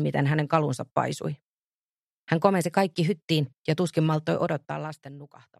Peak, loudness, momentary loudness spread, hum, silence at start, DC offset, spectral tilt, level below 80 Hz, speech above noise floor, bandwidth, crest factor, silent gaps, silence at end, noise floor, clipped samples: -4 dBFS; -26 LUFS; 13 LU; none; 0 s; under 0.1%; -6.5 dB/octave; -68 dBFS; over 64 dB; 13 kHz; 22 dB; 0.92-0.96 s, 1.42-2.27 s, 3.22-3.28 s, 3.58-3.64 s; 0.35 s; under -90 dBFS; under 0.1%